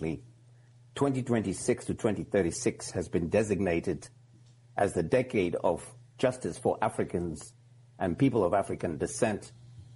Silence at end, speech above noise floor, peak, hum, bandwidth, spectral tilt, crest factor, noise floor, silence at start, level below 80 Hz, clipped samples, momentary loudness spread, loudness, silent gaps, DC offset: 0 s; 28 dB; -12 dBFS; none; 11.5 kHz; -6 dB/octave; 18 dB; -57 dBFS; 0 s; -56 dBFS; under 0.1%; 12 LU; -30 LUFS; none; under 0.1%